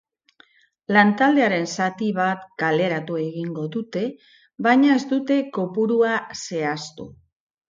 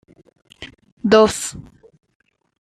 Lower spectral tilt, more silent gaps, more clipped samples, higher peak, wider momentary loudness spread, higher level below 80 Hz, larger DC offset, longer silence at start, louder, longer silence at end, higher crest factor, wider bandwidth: first, -5.5 dB/octave vs -4 dB/octave; second, none vs 0.92-0.97 s; neither; about the same, -4 dBFS vs -2 dBFS; second, 12 LU vs 25 LU; second, -66 dBFS vs -52 dBFS; neither; first, 0.9 s vs 0.6 s; second, -21 LUFS vs -17 LUFS; second, 0.6 s vs 1 s; about the same, 18 dB vs 20 dB; second, 7.6 kHz vs 14.5 kHz